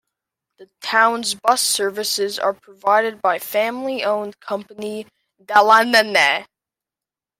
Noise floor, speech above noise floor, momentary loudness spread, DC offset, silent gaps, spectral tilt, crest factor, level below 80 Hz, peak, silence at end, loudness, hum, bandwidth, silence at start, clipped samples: -89 dBFS; 71 dB; 16 LU; under 0.1%; none; -1 dB/octave; 18 dB; -72 dBFS; 0 dBFS; 0.95 s; -18 LUFS; none; 16.5 kHz; 0.6 s; under 0.1%